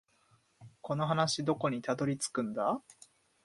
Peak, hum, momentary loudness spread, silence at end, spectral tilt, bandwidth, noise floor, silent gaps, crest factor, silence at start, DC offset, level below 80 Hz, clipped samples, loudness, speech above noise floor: -14 dBFS; none; 8 LU; 0.55 s; -5 dB/octave; 11.5 kHz; -70 dBFS; none; 20 dB; 0.6 s; under 0.1%; -72 dBFS; under 0.1%; -33 LUFS; 37 dB